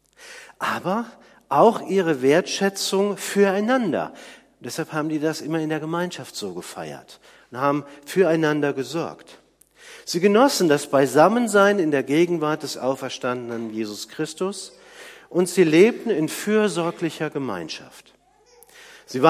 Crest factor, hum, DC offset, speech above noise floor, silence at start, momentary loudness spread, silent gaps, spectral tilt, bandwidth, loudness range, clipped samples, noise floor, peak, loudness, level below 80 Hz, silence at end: 22 dB; none; under 0.1%; 34 dB; 0.2 s; 17 LU; none; -5 dB/octave; 15.5 kHz; 8 LU; under 0.1%; -56 dBFS; 0 dBFS; -21 LUFS; -70 dBFS; 0 s